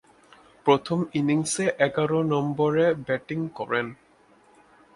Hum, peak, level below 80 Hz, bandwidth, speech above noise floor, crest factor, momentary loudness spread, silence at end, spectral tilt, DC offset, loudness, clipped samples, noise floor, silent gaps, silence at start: none; -6 dBFS; -64 dBFS; 11.5 kHz; 34 dB; 20 dB; 7 LU; 1 s; -5.5 dB/octave; under 0.1%; -25 LUFS; under 0.1%; -58 dBFS; none; 0.65 s